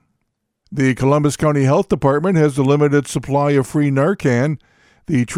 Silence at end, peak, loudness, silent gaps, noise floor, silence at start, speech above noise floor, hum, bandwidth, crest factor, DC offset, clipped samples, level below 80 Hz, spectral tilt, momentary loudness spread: 0 s; -2 dBFS; -16 LUFS; none; -73 dBFS; 0.7 s; 57 dB; none; 14 kHz; 14 dB; under 0.1%; under 0.1%; -46 dBFS; -7 dB/octave; 5 LU